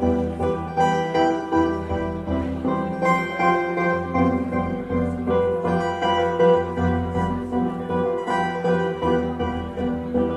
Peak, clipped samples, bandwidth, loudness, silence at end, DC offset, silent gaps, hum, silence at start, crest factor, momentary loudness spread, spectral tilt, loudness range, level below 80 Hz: -6 dBFS; under 0.1%; 11 kHz; -22 LUFS; 0 s; under 0.1%; none; none; 0 s; 16 dB; 5 LU; -7.5 dB/octave; 2 LU; -40 dBFS